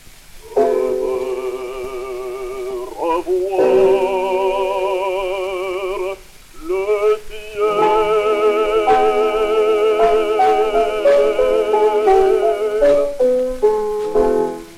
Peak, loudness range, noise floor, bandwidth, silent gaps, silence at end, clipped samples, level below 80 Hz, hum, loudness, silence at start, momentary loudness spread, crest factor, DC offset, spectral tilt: -2 dBFS; 6 LU; -39 dBFS; 14.5 kHz; none; 0 s; under 0.1%; -40 dBFS; none; -17 LUFS; 0.05 s; 12 LU; 14 dB; under 0.1%; -4.5 dB/octave